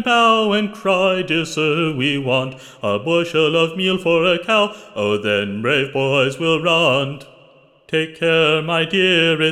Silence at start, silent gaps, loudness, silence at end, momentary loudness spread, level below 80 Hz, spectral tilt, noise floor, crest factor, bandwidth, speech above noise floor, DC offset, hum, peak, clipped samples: 0 s; none; -17 LUFS; 0 s; 8 LU; -58 dBFS; -5 dB/octave; -50 dBFS; 16 dB; 13.5 kHz; 32 dB; under 0.1%; none; -2 dBFS; under 0.1%